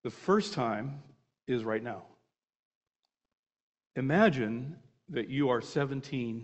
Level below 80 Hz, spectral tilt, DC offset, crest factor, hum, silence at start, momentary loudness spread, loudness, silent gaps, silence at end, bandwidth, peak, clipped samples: -68 dBFS; -6.5 dB/octave; under 0.1%; 24 dB; none; 0.05 s; 16 LU; -31 LUFS; 2.56-2.81 s, 3.39-3.43 s, 3.62-3.73 s; 0 s; 8.4 kHz; -10 dBFS; under 0.1%